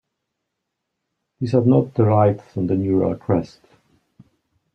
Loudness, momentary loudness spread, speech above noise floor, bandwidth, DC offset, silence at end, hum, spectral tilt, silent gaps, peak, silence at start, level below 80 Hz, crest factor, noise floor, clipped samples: -19 LUFS; 9 LU; 61 dB; 6.6 kHz; under 0.1%; 1.3 s; none; -10.5 dB/octave; none; -4 dBFS; 1.4 s; -56 dBFS; 18 dB; -79 dBFS; under 0.1%